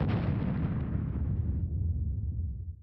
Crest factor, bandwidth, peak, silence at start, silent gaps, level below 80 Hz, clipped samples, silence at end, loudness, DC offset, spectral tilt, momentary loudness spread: 12 dB; 4.9 kHz; -18 dBFS; 0 s; none; -38 dBFS; under 0.1%; 0 s; -33 LUFS; under 0.1%; -11.5 dB/octave; 5 LU